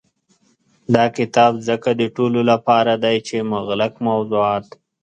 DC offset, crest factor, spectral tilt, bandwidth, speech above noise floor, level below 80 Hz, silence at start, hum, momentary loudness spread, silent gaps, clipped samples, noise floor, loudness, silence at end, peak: under 0.1%; 18 dB; -6 dB/octave; 8.8 kHz; 43 dB; -58 dBFS; 0.9 s; none; 7 LU; none; under 0.1%; -61 dBFS; -18 LUFS; 0.4 s; 0 dBFS